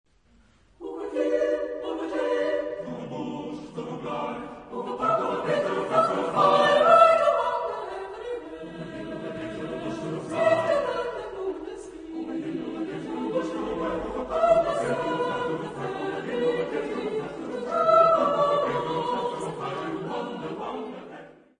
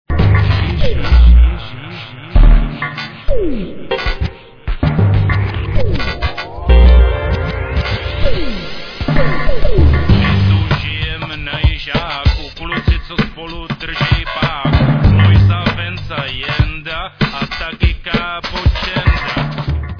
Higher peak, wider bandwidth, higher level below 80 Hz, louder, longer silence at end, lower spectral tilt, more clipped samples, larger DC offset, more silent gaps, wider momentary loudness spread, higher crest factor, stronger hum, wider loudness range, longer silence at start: second, -4 dBFS vs 0 dBFS; first, 10 kHz vs 5.4 kHz; second, -58 dBFS vs -16 dBFS; second, -26 LUFS vs -15 LUFS; first, 0.25 s vs 0 s; second, -5.5 dB/octave vs -7.5 dB/octave; neither; neither; neither; first, 16 LU vs 12 LU; first, 22 dB vs 12 dB; neither; first, 9 LU vs 4 LU; first, 0.8 s vs 0.1 s